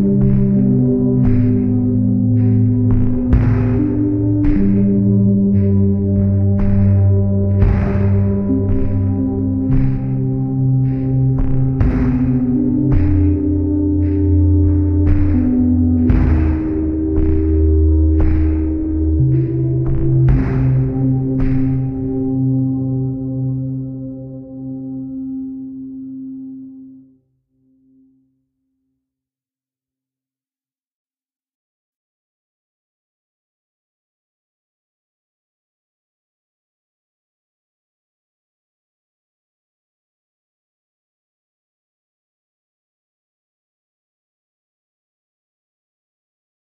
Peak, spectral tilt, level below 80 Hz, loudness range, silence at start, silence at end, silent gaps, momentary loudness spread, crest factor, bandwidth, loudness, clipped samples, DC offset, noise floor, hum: -2 dBFS; -13 dB/octave; -24 dBFS; 11 LU; 0 s; 19.8 s; none; 12 LU; 16 dB; 3 kHz; -16 LUFS; under 0.1%; under 0.1%; under -90 dBFS; none